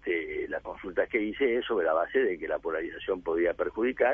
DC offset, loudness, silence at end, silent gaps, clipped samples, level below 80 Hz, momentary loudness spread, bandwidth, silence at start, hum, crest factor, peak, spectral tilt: under 0.1%; -30 LUFS; 0 s; none; under 0.1%; -58 dBFS; 7 LU; 3.7 kHz; 0 s; none; 16 dB; -12 dBFS; -7 dB/octave